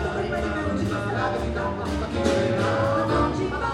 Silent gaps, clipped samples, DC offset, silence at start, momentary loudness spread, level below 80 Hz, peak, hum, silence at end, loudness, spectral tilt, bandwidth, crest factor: none; under 0.1%; under 0.1%; 0 s; 5 LU; -36 dBFS; -8 dBFS; none; 0 s; -25 LUFS; -6.5 dB/octave; 12.5 kHz; 16 dB